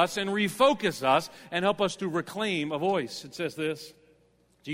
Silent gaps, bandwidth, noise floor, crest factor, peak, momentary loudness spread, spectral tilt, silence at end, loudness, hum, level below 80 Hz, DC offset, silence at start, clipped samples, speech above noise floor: none; 16 kHz; -65 dBFS; 18 dB; -10 dBFS; 11 LU; -4.5 dB/octave; 0 s; -28 LUFS; none; -66 dBFS; under 0.1%; 0 s; under 0.1%; 37 dB